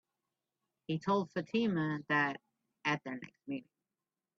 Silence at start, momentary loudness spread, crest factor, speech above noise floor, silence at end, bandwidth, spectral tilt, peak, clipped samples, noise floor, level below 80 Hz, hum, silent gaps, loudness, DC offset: 0.9 s; 13 LU; 18 dB; over 55 dB; 0.75 s; 7.6 kHz; -6.5 dB/octave; -20 dBFS; under 0.1%; under -90 dBFS; -78 dBFS; none; none; -35 LUFS; under 0.1%